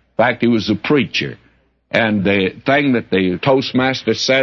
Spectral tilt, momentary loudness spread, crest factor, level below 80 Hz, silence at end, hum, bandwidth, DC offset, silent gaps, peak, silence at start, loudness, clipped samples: -5.5 dB/octave; 3 LU; 14 dB; -54 dBFS; 0 s; none; 7.2 kHz; under 0.1%; none; -2 dBFS; 0.2 s; -16 LUFS; under 0.1%